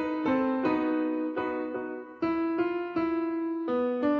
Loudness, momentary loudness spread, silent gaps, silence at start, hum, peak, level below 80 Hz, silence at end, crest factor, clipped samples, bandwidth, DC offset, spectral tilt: -29 LUFS; 6 LU; none; 0 s; none; -16 dBFS; -64 dBFS; 0 s; 12 dB; under 0.1%; 5.2 kHz; under 0.1%; -8 dB/octave